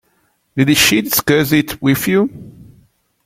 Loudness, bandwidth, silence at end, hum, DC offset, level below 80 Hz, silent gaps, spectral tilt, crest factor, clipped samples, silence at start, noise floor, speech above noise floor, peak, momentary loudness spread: -14 LUFS; 16.5 kHz; 0.65 s; none; under 0.1%; -46 dBFS; none; -4 dB/octave; 16 dB; under 0.1%; 0.55 s; -61 dBFS; 47 dB; 0 dBFS; 7 LU